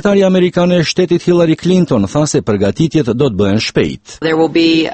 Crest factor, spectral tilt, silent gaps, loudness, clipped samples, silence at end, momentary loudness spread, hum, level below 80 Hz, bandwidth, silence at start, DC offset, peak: 12 dB; -6 dB/octave; none; -12 LUFS; under 0.1%; 0 s; 4 LU; none; -42 dBFS; 8.8 kHz; 0.05 s; under 0.1%; 0 dBFS